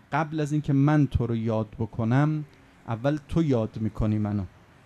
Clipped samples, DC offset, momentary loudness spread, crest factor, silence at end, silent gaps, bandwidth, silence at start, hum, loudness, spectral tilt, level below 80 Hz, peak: under 0.1%; under 0.1%; 11 LU; 16 dB; 0.4 s; none; 9.4 kHz; 0.1 s; none; -26 LUFS; -8.5 dB/octave; -42 dBFS; -10 dBFS